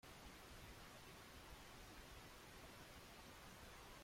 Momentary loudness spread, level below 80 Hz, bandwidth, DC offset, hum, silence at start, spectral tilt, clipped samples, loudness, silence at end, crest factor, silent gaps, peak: 0 LU; -68 dBFS; 16.5 kHz; under 0.1%; none; 0.05 s; -3.5 dB/octave; under 0.1%; -60 LUFS; 0 s; 14 dB; none; -46 dBFS